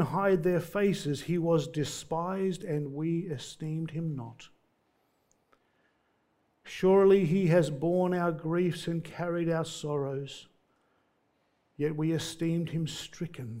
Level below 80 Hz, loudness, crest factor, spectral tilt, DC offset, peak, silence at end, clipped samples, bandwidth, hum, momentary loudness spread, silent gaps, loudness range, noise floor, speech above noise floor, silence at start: -62 dBFS; -30 LUFS; 18 dB; -6.5 dB/octave; under 0.1%; -12 dBFS; 0 s; under 0.1%; 16 kHz; none; 13 LU; none; 10 LU; -73 dBFS; 44 dB; 0 s